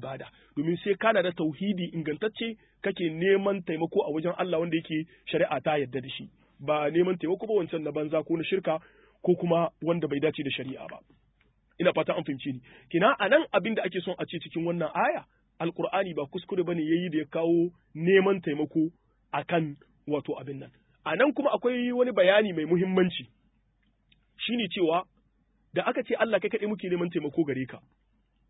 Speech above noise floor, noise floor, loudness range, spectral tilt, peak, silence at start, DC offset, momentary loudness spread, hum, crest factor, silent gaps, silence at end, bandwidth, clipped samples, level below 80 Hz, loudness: 42 dB; -70 dBFS; 4 LU; -10.5 dB/octave; -8 dBFS; 0 s; under 0.1%; 11 LU; none; 20 dB; none; 0.7 s; 4 kHz; under 0.1%; -68 dBFS; -28 LUFS